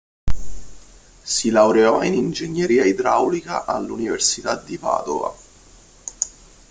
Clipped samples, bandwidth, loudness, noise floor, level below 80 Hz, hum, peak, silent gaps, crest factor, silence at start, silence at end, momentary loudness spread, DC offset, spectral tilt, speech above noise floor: under 0.1%; 9.6 kHz; -20 LUFS; -48 dBFS; -40 dBFS; none; -2 dBFS; none; 18 dB; 0.25 s; 0.4 s; 17 LU; under 0.1%; -3.5 dB/octave; 29 dB